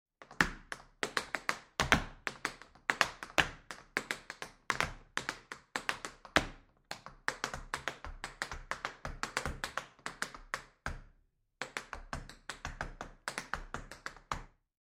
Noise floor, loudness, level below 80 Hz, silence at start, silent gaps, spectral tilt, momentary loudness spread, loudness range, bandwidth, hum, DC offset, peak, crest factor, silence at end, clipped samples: -72 dBFS; -38 LUFS; -52 dBFS; 0.2 s; none; -2.5 dB/octave; 15 LU; 10 LU; 16 kHz; none; under 0.1%; -2 dBFS; 36 dB; 0.4 s; under 0.1%